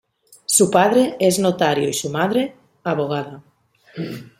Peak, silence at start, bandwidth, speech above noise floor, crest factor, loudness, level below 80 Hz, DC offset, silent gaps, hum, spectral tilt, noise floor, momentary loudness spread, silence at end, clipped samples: 0 dBFS; 0.5 s; 16.5 kHz; 35 dB; 20 dB; -18 LUFS; -62 dBFS; under 0.1%; none; none; -4 dB/octave; -54 dBFS; 16 LU; 0.15 s; under 0.1%